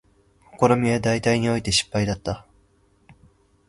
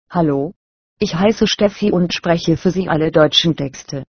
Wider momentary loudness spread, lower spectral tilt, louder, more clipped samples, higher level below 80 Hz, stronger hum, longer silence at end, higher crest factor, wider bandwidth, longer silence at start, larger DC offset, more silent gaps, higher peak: about the same, 10 LU vs 11 LU; about the same, -4.5 dB/octave vs -5.5 dB/octave; second, -22 LUFS vs -16 LUFS; neither; about the same, -46 dBFS vs -44 dBFS; neither; first, 1.25 s vs 0.1 s; first, 22 dB vs 16 dB; first, 11.5 kHz vs 6.6 kHz; first, 0.55 s vs 0.1 s; neither; second, none vs 0.56-0.97 s; about the same, -2 dBFS vs 0 dBFS